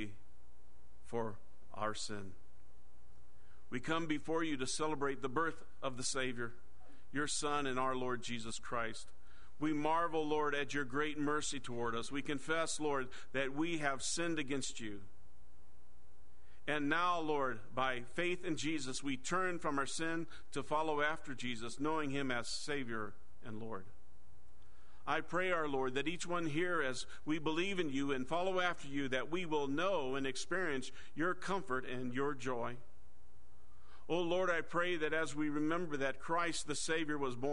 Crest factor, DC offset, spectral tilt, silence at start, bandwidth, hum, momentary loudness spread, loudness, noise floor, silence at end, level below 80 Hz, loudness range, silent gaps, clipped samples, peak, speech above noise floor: 20 dB; 1%; -4 dB/octave; 0 s; 10.5 kHz; none; 9 LU; -38 LUFS; -66 dBFS; 0 s; -64 dBFS; 5 LU; none; under 0.1%; -18 dBFS; 27 dB